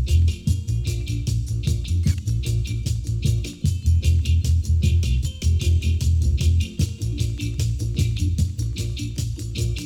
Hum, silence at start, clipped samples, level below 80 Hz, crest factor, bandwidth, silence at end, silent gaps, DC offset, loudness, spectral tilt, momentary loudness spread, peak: none; 0 s; under 0.1%; -26 dBFS; 12 dB; 15 kHz; 0 s; none; under 0.1%; -23 LUFS; -5.5 dB/octave; 6 LU; -8 dBFS